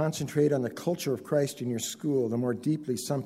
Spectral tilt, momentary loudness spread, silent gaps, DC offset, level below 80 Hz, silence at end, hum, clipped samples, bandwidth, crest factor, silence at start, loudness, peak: -5.5 dB/octave; 5 LU; none; under 0.1%; -68 dBFS; 0 s; none; under 0.1%; 16 kHz; 16 dB; 0 s; -29 LUFS; -14 dBFS